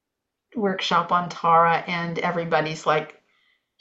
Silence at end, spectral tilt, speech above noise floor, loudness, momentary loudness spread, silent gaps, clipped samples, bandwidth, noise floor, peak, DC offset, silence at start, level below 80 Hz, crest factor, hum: 0.7 s; -5 dB/octave; 60 dB; -22 LUFS; 9 LU; none; under 0.1%; 8 kHz; -82 dBFS; -6 dBFS; under 0.1%; 0.55 s; -68 dBFS; 18 dB; none